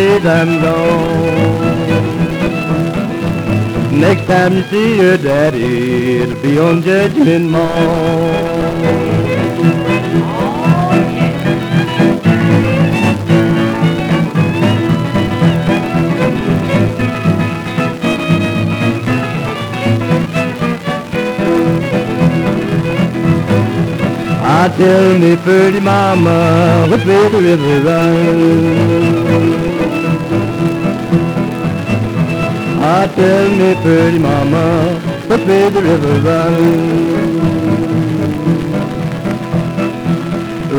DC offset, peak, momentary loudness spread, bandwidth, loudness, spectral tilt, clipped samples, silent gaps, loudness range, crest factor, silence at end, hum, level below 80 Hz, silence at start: 0.2%; 0 dBFS; 6 LU; 18 kHz; -12 LUFS; -7.5 dB/octave; under 0.1%; none; 5 LU; 12 dB; 0 s; none; -38 dBFS; 0 s